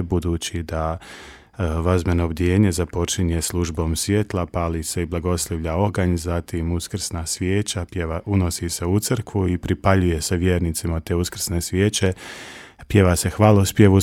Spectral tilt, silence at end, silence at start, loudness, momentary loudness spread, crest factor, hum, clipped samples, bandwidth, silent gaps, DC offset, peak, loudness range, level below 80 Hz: -5.5 dB/octave; 0 s; 0 s; -21 LUFS; 9 LU; 20 dB; none; under 0.1%; 16.5 kHz; none; under 0.1%; 0 dBFS; 3 LU; -34 dBFS